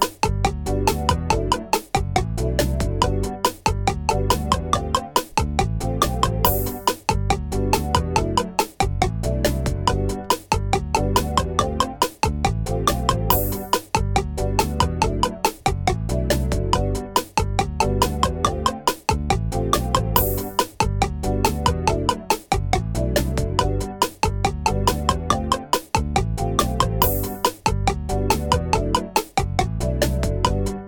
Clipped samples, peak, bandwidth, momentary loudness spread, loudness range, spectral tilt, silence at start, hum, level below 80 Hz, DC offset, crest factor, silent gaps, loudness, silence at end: under 0.1%; 0 dBFS; 19.5 kHz; 3 LU; 1 LU; -4.5 dB/octave; 0 s; none; -28 dBFS; under 0.1%; 20 dB; none; -22 LUFS; 0 s